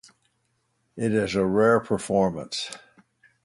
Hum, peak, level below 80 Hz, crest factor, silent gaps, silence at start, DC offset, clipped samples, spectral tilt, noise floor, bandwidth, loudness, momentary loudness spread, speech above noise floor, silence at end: none; -8 dBFS; -56 dBFS; 18 dB; none; 0.95 s; under 0.1%; under 0.1%; -5.5 dB/octave; -72 dBFS; 11.5 kHz; -24 LUFS; 11 LU; 49 dB; 0.7 s